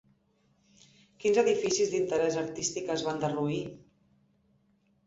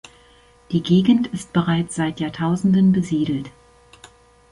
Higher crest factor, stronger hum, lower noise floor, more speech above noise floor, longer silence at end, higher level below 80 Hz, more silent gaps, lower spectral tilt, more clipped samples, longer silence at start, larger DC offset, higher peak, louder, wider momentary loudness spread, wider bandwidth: about the same, 20 dB vs 16 dB; neither; first, -70 dBFS vs -52 dBFS; first, 41 dB vs 33 dB; first, 1.3 s vs 1.05 s; second, -68 dBFS vs -52 dBFS; neither; second, -4 dB/octave vs -7 dB/octave; neither; first, 1.2 s vs 0.7 s; neither; second, -12 dBFS vs -4 dBFS; second, -29 LUFS vs -20 LUFS; about the same, 7 LU vs 9 LU; second, 8 kHz vs 11.5 kHz